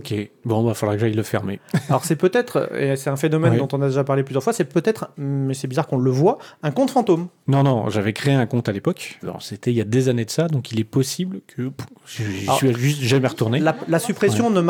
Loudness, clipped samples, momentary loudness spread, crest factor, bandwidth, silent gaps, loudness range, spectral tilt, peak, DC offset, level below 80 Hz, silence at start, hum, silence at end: -21 LUFS; under 0.1%; 9 LU; 18 dB; 18 kHz; none; 3 LU; -6 dB/octave; -4 dBFS; under 0.1%; -64 dBFS; 0 s; none; 0 s